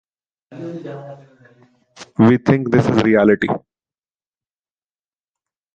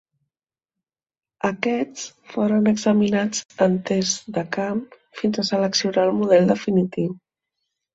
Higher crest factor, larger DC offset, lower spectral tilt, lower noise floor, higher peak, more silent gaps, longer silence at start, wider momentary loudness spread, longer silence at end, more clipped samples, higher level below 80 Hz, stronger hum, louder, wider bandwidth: about the same, 18 dB vs 18 dB; neither; first, -8 dB/octave vs -5 dB/octave; about the same, under -90 dBFS vs under -90 dBFS; about the same, -2 dBFS vs -4 dBFS; second, none vs 3.45-3.49 s; second, 0.5 s vs 1.45 s; first, 19 LU vs 11 LU; first, 2.15 s vs 0.8 s; neither; first, -52 dBFS vs -62 dBFS; neither; first, -15 LUFS vs -21 LUFS; about the same, 7.8 kHz vs 8 kHz